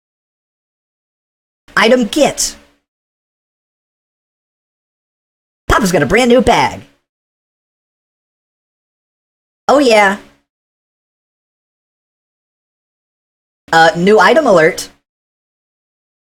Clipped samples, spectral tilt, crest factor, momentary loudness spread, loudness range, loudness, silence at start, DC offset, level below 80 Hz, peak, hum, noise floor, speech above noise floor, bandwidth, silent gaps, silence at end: under 0.1%; -4 dB/octave; 16 dB; 11 LU; 8 LU; -11 LUFS; 1.75 s; under 0.1%; -38 dBFS; 0 dBFS; none; under -90 dBFS; over 80 dB; 18 kHz; 2.88-5.68 s, 7.09-9.67 s, 10.49-13.68 s; 1.4 s